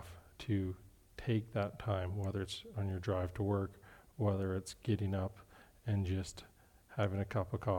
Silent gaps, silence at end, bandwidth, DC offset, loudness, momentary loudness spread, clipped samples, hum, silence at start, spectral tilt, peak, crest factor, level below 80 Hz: none; 0 s; 15.5 kHz; under 0.1%; -39 LUFS; 12 LU; under 0.1%; none; 0 s; -7 dB/octave; -20 dBFS; 18 dB; -62 dBFS